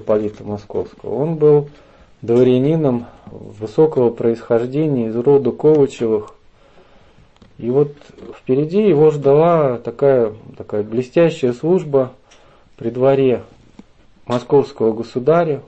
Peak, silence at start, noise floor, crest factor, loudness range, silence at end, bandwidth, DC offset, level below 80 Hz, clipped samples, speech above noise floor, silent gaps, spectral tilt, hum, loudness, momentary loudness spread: -2 dBFS; 0 s; -48 dBFS; 14 dB; 4 LU; 0.05 s; 8.2 kHz; under 0.1%; -52 dBFS; under 0.1%; 32 dB; none; -8.5 dB/octave; none; -16 LUFS; 13 LU